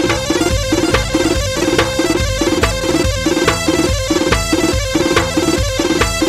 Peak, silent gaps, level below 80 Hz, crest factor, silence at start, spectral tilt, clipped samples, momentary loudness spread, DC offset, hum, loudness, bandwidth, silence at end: 0 dBFS; none; -24 dBFS; 14 dB; 0 s; -4 dB/octave; under 0.1%; 2 LU; under 0.1%; none; -15 LUFS; 16 kHz; 0 s